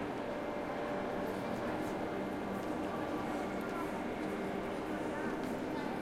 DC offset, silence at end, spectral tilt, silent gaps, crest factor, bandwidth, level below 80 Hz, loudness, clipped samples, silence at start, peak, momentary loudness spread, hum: under 0.1%; 0 s; -6 dB/octave; none; 12 dB; 16.5 kHz; -60 dBFS; -39 LUFS; under 0.1%; 0 s; -26 dBFS; 1 LU; none